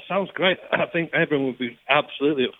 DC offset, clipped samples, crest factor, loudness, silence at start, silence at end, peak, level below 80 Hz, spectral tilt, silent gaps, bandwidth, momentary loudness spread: under 0.1%; under 0.1%; 22 dB; -23 LUFS; 0 s; 0.1 s; -2 dBFS; -66 dBFS; -8 dB/octave; none; 4.2 kHz; 5 LU